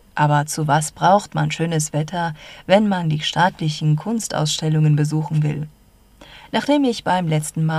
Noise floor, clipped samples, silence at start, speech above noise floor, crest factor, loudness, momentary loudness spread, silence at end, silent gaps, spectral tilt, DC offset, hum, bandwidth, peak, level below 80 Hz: -48 dBFS; under 0.1%; 0.15 s; 29 dB; 18 dB; -19 LUFS; 7 LU; 0 s; none; -5.5 dB/octave; under 0.1%; none; 13.5 kHz; -2 dBFS; -52 dBFS